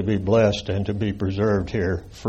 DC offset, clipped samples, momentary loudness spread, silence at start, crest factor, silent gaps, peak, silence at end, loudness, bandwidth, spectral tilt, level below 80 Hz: under 0.1%; under 0.1%; 7 LU; 0 s; 14 dB; none; -8 dBFS; 0 s; -22 LUFS; 8.2 kHz; -7 dB/octave; -42 dBFS